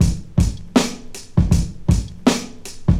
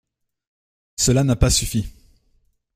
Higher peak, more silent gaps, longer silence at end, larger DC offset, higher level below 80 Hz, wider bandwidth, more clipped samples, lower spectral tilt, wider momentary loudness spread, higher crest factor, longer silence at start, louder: about the same, 0 dBFS vs -2 dBFS; neither; second, 0 s vs 0.85 s; neither; first, -26 dBFS vs -32 dBFS; about the same, 15.5 kHz vs 16 kHz; neither; first, -6 dB/octave vs -4.5 dB/octave; second, 7 LU vs 17 LU; about the same, 18 dB vs 20 dB; second, 0 s vs 1 s; about the same, -20 LUFS vs -19 LUFS